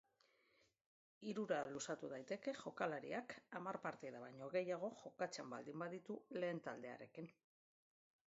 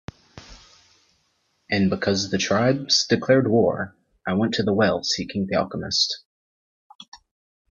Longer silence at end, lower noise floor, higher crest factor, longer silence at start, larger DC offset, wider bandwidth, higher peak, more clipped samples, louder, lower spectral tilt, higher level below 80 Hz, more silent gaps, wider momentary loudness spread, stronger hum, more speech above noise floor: first, 0.95 s vs 0.55 s; first, -79 dBFS vs -69 dBFS; about the same, 22 dB vs 18 dB; first, 1.2 s vs 0.35 s; neither; about the same, 7.6 kHz vs 7.6 kHz; second, -28 dBFS vs -4 dBFS; neither; second, -48 LUFS vs -21 LUFS; about the same, -4.5 dB/octave vs -4.5 dB/octave; second, under -90 dBFS vs -58 dBFS; second, none vs 6.25-6.99 s, 7.08-7.12 s; about the same, 10 LU vs 9 LU; neither; second, 31 dB vs 47 dB